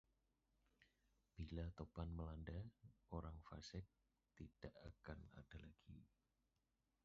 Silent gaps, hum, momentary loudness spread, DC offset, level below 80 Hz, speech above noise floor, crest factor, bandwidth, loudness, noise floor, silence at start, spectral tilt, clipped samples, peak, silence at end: none; none; 13 LU; under 0.1%; -62 dBFS; 34 dB; 22 dB; 7.2 kHz; -57 LUFS; -89 dBFS; 0.8 s; -6.5 dB/octave; under 0.1%; -34 dBFS; 1 s